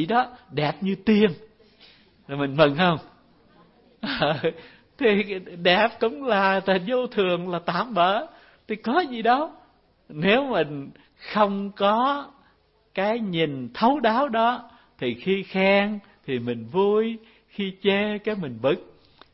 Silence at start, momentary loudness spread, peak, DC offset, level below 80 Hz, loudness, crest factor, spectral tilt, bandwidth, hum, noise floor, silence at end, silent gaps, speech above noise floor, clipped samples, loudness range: 0 s; 12 LU; -4 dBFS; under 0.1%; -60 dBFS; -23 LUFS; 20 dB; -10 dB/octave; 5.8 kHz; none; -62 dBFS; 0.5 s; none; 39 dB; under 0.1%; 3 LU